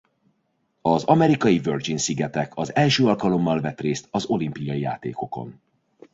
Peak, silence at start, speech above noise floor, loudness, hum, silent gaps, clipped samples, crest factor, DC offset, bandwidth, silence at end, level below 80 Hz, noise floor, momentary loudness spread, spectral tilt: -4 dBFS; 0.85 s; 49 dB; -22 LUFS; none; none; under 0.1%; 20 dB; under 0.1%; 8 kHz; 0.6 s; -58 dBFS; -71 dBFS; 12 LU; -5.5 dB/octave